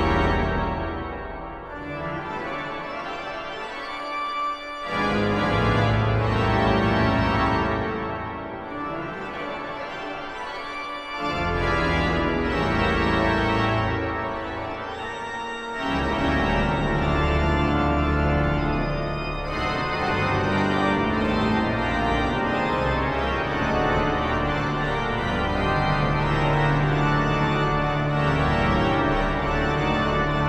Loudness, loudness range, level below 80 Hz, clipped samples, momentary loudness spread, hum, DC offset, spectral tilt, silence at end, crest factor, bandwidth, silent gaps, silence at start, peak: -24 LUFS; 7 LU; -34 dBFS; under 0.1%; 10 LU; none; under 0.1%; -7 dB/octave; 0 s; 16 dB; 10 kHz; none; 0 s; -8 dBFS